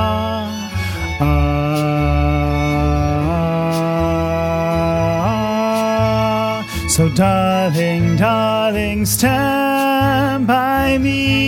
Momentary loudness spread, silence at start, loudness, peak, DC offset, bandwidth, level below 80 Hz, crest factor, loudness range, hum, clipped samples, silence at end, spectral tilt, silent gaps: 4 LU; 0 s; -16 LUFS; -2 dBFS; under 0.1%; 18 kHz; -28 dBFS; 14 dB; 2 LU; none; under 0.1%; 0 s; -5.5 dB/octave; none